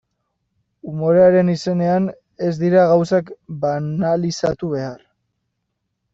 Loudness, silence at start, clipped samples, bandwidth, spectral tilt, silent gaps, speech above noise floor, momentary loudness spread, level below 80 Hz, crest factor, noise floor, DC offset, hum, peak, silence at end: -18 LUFS; 0.85 s; under 0.1%; 7.8 kHz; -7.5 dB/octave; none; 58 dB; 13 LU; -56 dBFS; 16 dB; -75 dBFS; under 0.1%; none; -4 dBFS; 1.15 s